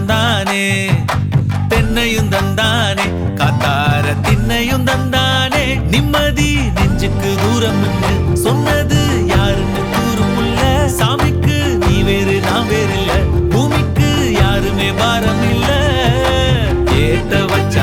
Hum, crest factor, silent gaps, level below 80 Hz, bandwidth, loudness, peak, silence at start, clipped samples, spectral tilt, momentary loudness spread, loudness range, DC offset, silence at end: none; 12 dB; none; -24 dBFS; 18 kHz; -14 LUFS; 0 dBFS; 0 s; under 0.1%; -5.5 dB/octave; 2 LU; 1 LU; under 0.1%; 0 s